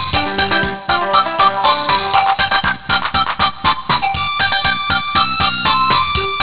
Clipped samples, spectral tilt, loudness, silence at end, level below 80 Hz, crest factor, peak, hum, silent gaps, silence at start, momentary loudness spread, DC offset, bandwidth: under 0.1%; -7.5 dB/octave; -14 LUFS; 0 s; -36 dBFS; 14 dB; -2 dBFS; none; none; 0 s; 4 LU; 2%; 4 kHz